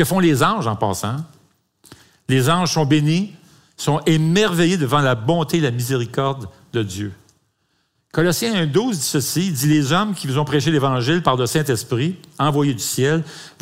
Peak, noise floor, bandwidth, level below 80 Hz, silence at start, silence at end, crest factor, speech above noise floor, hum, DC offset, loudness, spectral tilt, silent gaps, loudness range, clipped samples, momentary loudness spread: -2 dBFS; -67 dBFS; 16 kHz; -54 dBFS; 0 s; 0.15 s; 18 dB; 49 dB; none; under 0.1%; -19 LUFS; -5 dB/octave; none; 4 LU; under 0.1%; 10 LU